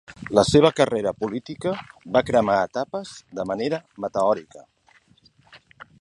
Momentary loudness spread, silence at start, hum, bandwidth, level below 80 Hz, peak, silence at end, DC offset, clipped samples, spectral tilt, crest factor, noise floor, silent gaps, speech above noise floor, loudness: 13 LU; 0.1 s; none; 11.5 kHz; -52 dBFS; -2 dBFS; 0.15 s; under 0.1%; under 0.1%; -5.5 dB/octave; 22 dB; -58 dBFS; none; 36 dB; -23 LUFS